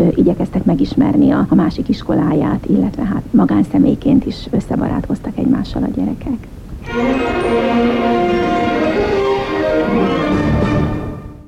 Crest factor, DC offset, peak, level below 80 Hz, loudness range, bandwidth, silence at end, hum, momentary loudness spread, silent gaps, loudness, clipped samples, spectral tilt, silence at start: 12 dB; under 0.1%; -2 dBFS; -32 dBFS; 4 LU; 10.5 kHz; 0.05 s; none; 7 LU; none; -15 LUFS; under 0.1%; -8 dB/octave; 0 s